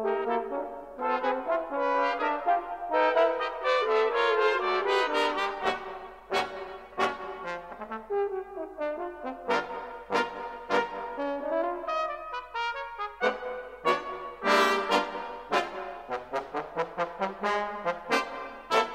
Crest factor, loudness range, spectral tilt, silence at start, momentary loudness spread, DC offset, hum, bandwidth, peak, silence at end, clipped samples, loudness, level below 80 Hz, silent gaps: 20 dB; 7 LU; -3.5 dB/octave; 0 s; 12 LU; under 0.1%; none; 16 kHz; -10 dBFS; 0 s; under 0.1%; -29 LUFS; -62 dBFS; none